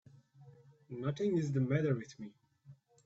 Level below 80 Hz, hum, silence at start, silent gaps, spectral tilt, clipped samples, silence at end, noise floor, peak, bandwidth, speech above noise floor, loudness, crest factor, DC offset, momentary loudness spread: -74 dBFS; none; 0.4 s; none; -8 dB/octave; under 0.1%; 0.3 s; -61 dBFS; -20 dBFS; 7.8 kHz; 27 dB; -35 LUFS; 18 dB; under 0.1%; 18 LU